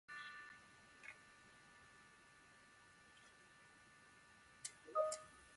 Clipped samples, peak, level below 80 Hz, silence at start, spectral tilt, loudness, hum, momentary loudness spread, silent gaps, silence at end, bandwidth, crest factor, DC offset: under 0.1%; -28 dBFS; -84 dBFS; 0.1 s; -1.5 dB/octave; -49 LUFS; none; 22 LU; none; 0 s; 11.5 kHz; 26 dB; under 0.1%